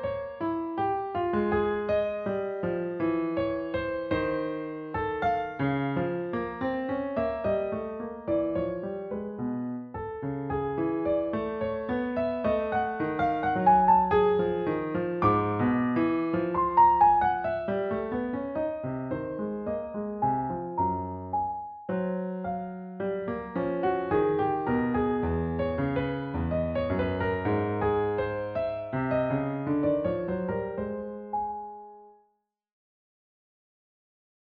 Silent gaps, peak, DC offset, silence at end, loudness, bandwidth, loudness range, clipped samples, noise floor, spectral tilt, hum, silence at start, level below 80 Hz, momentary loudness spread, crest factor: none; -10 dBFS; under 0.1%; 2.35 s; -28 LUFS; 5.2 kHz; 7 LU; under 0.1%; -74 dBFS; -6.5 dB/octave; none; 0 s; -50 dBFS; 9 LU; 18 dB